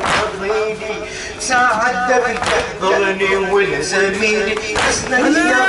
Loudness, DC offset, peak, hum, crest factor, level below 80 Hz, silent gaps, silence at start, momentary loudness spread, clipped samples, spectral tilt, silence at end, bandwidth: -16 LUFS; under 0.1%; -4 dBFS; none; 12 dB; -40 dBFS; none; 0 s; 7 LU; under 0.1%; -3 dB/octave; 0 s; 11.5 kHz